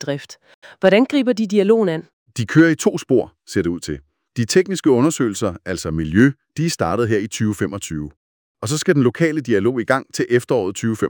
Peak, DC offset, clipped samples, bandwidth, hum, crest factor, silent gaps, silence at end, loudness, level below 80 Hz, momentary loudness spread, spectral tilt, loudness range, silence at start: -2 dBFS; under 0.1%; under 0.1%; over 20 kHz; none; 18 dB; 0.54-0.62 s, 2.13-2.26 s, 8.17-8.55 s; 0 s; -18 LUFS; -48 dBFS; 12 LU; -5.5 dB/octave; 3 LU; 0 s